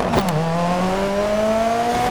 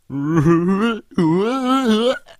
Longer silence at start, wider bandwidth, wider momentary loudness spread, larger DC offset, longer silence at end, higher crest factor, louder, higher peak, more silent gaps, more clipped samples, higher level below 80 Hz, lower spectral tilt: about the same, 0 s vs 0.1 s; first, over 20 kHz vs 14 kHz; about the same, 2 LU vs 4 LU; neither; second, 0 s vs 0.2 s; about the same, 16 dB vs 16 dB; about the same, -19 LUFS vs -17 LUFS; about the same, -4 dBFS vs -2 dBFS; neither; neither; first, -38 dBFS vs -48 dBFS; second, -5.5 dB/octave vs -7 dB/octave